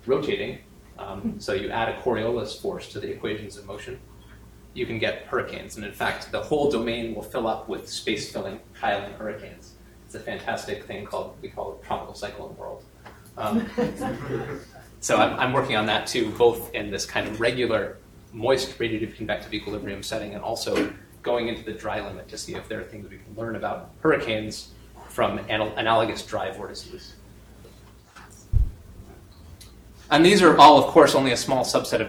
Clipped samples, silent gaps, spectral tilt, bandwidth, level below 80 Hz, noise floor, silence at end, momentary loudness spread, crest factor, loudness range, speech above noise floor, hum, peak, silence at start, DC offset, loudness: under 0.1%; none; -4.5 dB/octave; 19.5 kHz; -42 dBFS; -49 dBFS; 0 s; 17 LU; 24 dB; 9 LU; 25 dB; none; -2 dBFS; 0.05 s; under 0.1%; -24 LUFS